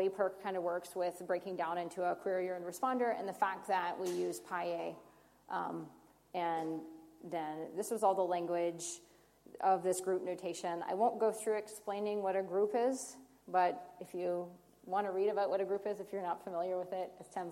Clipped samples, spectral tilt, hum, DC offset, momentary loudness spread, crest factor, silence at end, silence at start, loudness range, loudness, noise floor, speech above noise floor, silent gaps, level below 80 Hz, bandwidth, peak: under 0.1%; -4.5 dB/octave; 50 Hz at -75 dBFS; under 0.1%; 11 LU; 18 dB; 0 s; 0 s; 4 LU; -37 LUFS; -59 dBFS; 23 dB; none; -80 dBFS; 16.5 kHz; -18 dBFS